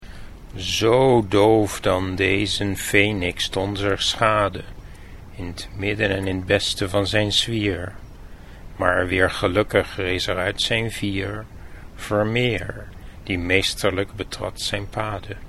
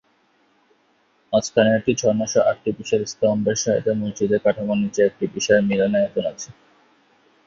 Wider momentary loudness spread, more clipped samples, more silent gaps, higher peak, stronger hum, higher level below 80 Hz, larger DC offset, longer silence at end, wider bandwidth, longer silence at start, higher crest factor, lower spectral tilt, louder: first, 16 LU vs 7 LU; neither; neither; about the same, 0 dBFS vs -2 dBFS; neither; first, -40 dBFS vs -56 dBFS; neither; second, 0 s vs 0.95 s; first, 14 kHz vs 7.6 kHz; second, 0 s vs 1.3 s; about the same, 22 dB vs 18 dB; about the same, -4.5 dB/octave vs -5 dB/octave; about the same, -21 LUFS vs -20 LUFS